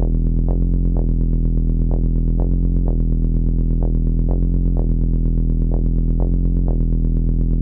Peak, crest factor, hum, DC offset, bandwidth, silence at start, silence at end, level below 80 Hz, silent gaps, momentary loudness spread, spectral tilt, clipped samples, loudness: -4 dBFS; 12 dB; none; under 0.1%; 1.2 kHz; 0 s; 0 s; -16 dBFS; none; 1 LU; -15 dB/octave; under 0.1%; -20 LUFS